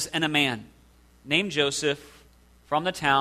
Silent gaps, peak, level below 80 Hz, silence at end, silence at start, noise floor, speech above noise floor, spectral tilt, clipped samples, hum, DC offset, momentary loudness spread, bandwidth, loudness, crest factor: none; -6 dBFS; -58 dBFS; 0 s; 0 s; -56 dBFS; 31 dB; -3 dB/octave; under 0.1%; none; under 0.1%; 7 LU; 14 kHz; -25 LUFS; 22 dB